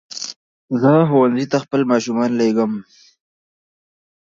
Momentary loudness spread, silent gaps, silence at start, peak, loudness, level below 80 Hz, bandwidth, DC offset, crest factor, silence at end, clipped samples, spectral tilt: 15 LU; 0.36-0.68 s; 0.1 s; -2 dBFS; -17 LUFS; -66 dBFS; 7.6 kHz; under 0.1%; 16 dB; 1.4 s; under 0.1%; -6.5 dB/octave